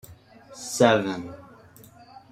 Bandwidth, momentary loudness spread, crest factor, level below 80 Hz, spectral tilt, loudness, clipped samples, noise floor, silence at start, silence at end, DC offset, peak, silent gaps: 16 kHz; 21 LU; 24 dB; -64 dBFS; -4.5 dB/octave; -23 LUFS; under 0.1%; -50 dBFS; 0.1 s; 0.9 s; under 0.1%; -2 dBFS; none